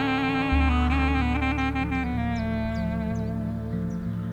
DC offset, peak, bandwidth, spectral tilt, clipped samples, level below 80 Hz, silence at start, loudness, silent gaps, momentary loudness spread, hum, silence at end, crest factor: under 0.1%; -10 dBFS; 8.4 kHz; -7.5 dB/octave; under 0.1%; -30 dBFS; 0 s; -26 LUFS; none; 7 LU; none; 0 s; 14 dB